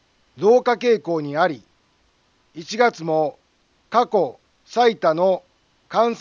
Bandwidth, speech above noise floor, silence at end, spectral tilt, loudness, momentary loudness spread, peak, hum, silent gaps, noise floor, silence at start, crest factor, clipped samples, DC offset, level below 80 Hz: 7.2 kHz; 44 dB; 0 s; -5.5 dB/octave; -20 LUFS; 10 LU; -4 dBFS; none; none; -62 dBFS; 0.35 s; 18 dB; under 0.1%; under 0.1%; -70 dBFS